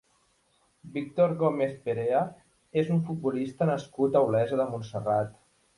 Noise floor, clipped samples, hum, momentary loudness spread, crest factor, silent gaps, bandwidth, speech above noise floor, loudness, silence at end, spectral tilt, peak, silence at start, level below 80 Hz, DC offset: -69 dBFS; under 0.1%; none; 9 LU; 18 dB; none; 11.5 kHz; 42 dB; -28 LUFS; 0.45 s; -8.5 dB/octave; -10 dBFS; 0.85 s; -66 dBFS; under 0.1%